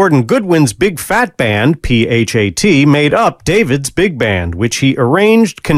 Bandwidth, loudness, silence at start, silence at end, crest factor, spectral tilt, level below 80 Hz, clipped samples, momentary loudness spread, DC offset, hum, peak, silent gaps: 16 kHz; -11 LUFS; 0 s; 0 s; 10 dB; -5.5 dB/octave; -32 dBFS; under 0.1%; 5 LU; under 0.1%; none; 0 dBFS; none